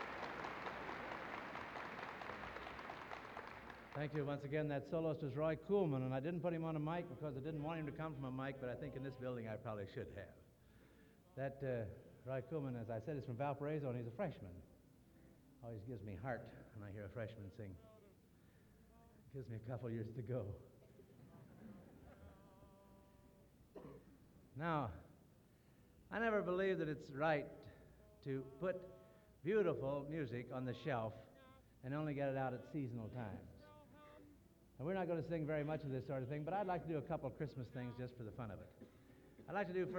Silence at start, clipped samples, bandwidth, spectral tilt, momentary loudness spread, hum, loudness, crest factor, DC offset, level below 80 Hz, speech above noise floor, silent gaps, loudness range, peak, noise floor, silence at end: 0 s; under 0.1%; 19.5 kHz; -8 dB/octave; 22 LU; none; -45 LUFS; 20 dB; under 0.1%; -70 dBFS; 25 dB; none; 10 LU; -26 dBFS; -69 dBFS; 0 s